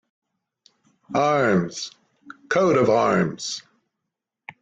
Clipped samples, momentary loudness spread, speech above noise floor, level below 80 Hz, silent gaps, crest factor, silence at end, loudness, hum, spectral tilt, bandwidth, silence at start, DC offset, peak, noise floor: under 0.1%; 14 LU; 63 dB; -62 dBFS; none; 16 dB; 1 s; -21 LUFS; none; -5.5 dB/octave; 9 kHz; 1.1 s; under 0.1%; -6 dBFS; -83 dBFS